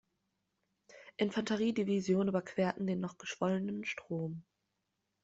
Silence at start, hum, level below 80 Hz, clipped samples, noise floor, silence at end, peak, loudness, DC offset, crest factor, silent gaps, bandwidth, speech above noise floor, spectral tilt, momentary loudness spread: 0.9 s; none; -74 dBFS; under 0.1%; -85 dBFS; 0.85 s; -18 dBFS; -35 LUFS; under 0.1%; 18 dB; none; 8 kHz; 50 dB; -6 dB/octave; 9 LU